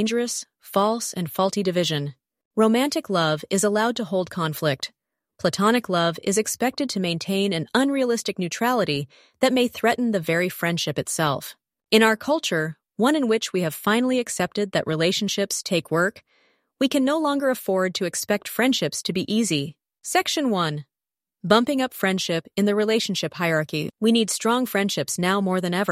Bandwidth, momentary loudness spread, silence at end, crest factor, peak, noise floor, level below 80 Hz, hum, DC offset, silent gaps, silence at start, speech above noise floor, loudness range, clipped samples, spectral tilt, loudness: 16 kHz; 6 LU; 0 s; 22 dB; -2 dBFS; under -90 dBFS; -66 dBFS; none; under 0.1%; 2.45-2.51 s; 0 s; over 67 dB; 2 LU; under 0.1%; -4 dB/octave; -23 LUFS